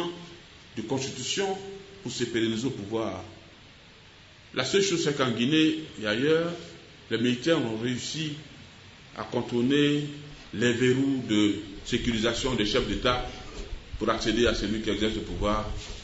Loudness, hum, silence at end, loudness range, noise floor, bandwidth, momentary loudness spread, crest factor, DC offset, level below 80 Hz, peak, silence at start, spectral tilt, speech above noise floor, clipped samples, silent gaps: -27 LUFS; none; 0 s; 5 LU; -52 dBFS; 8 kHz; 18 LU; 20 dB; under 0.1%; -44 dBFS; -8 dBFS; 0 s; -4.5 dB/octave; 25 dB; under 0.1%; none